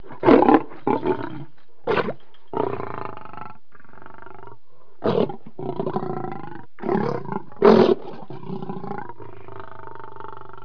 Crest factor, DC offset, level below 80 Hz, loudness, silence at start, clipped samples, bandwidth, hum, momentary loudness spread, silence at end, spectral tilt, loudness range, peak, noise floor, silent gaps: 22 dB; 3%; -54 dBFS; -22 LUFS; 0.1 s; under 0.1%; 5.4 kHz; none; 25 LU; 0.3 s; -8.5 dB/octave; 9 LU; 0 dBFS; -54 dBFS; none